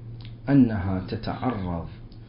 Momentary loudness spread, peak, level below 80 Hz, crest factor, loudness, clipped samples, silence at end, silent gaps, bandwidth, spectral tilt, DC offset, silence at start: 17 LU; -8 dBFS; -42 dBFS; 18 dB; -25 LUFS; under 0.1%; 0 s; none; 5.4 kHz; -12 dB/octave; under 0.1%; 0 s